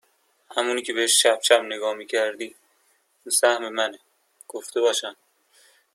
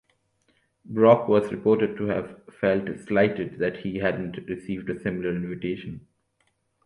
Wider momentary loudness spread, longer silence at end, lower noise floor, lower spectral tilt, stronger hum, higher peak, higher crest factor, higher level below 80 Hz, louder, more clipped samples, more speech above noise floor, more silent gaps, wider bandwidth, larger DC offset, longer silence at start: first, 19 LU vs 14 LU; about the same, 0.8 s vs 0.85 s; second, -65 dBFS vs -71 dBFS; second, 1 dB/octave vs -8 dB/octave; neither; about the same, -4 dBFS vs -4 dBFS; about the same, 22 dB vs 22 dB; second, -80 dBFS vs -56 dBFS; first, -22 LUFS vs -25 LUFS; neither; second, 43 dB vs 47 dB; neither; first, 15 kHz vs 11 kHz; neither; second, 0.5 s vs 0.9 s